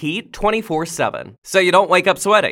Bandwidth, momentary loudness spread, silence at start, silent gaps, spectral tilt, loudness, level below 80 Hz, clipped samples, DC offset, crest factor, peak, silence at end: 17 kHz; 10 LU; 0 s; 1.38-1.42 s; -3.5 dB/octave; -17 LUFS; -44 dBFS; under 0.1%; under 0.1%; 16 dB; 0 dBFS; 0 s